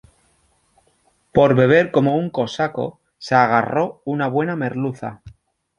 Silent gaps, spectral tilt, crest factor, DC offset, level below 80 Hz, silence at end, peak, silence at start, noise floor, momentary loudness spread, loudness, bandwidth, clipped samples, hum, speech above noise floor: none; -7.5 dB/octave; 18 dB; under 0.1%; -54 dBFS; 0.5 s; -2 dBFS; 1.35 s; -62 dBFS; 14 LU; -19 LUFS; 10.5 kHz; under 0.1%; none; 44 dB